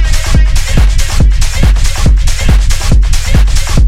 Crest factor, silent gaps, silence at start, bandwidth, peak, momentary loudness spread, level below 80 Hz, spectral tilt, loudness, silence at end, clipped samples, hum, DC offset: 6 dB; none; 0 s; 14.5 kHz; 0 dBFS; 1 LU; -8 dBFS; -4.5 dB/octave; -11 LUFS; 0 s; 0.3%; none; under 0.1%